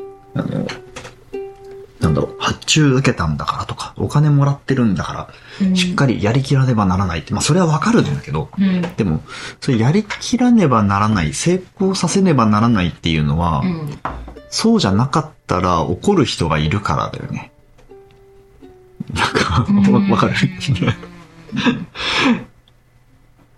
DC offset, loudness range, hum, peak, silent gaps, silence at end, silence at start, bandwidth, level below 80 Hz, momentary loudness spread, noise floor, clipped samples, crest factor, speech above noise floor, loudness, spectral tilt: 0.1%; 4 LU; none; 0 dBFS; none; 1.1 s; 0 s; 12 kHz; -40 dBFS; 14 LU; -51 dBFS; under 0.1%; 16 dB; 36 dB; -17 LUFS; -5.5 dB/octave